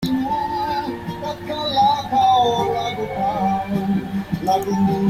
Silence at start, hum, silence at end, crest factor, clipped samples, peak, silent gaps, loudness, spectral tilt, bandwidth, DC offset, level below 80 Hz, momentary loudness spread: 0 s; none; 0 s; 12 dB; under 0.1%; -8 dBFS; none; -20 LUFS; -6 dB/octave; 16 kHz; under 0.1%; -46 dBFS; 10 LU